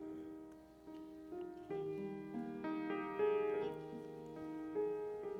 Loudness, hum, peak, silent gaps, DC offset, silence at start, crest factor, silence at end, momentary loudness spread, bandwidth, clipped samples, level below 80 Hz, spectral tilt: -43 LUFS; none; -26 dBFS; none; under 0.1%; 0 s; 18 dB; 0 s; 16 LU; 7.4 kHz; under 0.1%; -74 dBFS; -7.5 dB/octave